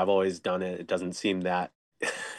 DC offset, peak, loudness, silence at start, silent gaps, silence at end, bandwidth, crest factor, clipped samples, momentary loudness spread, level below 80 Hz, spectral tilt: under 0.1%; -14 dBFS; -30 LUFS; 0 s; 1.75-1.92 s; 0 s; 12.5 kHz; 16 dB; under 0.1%; 7 LU; -76 dBFS; -4.5 dB/octave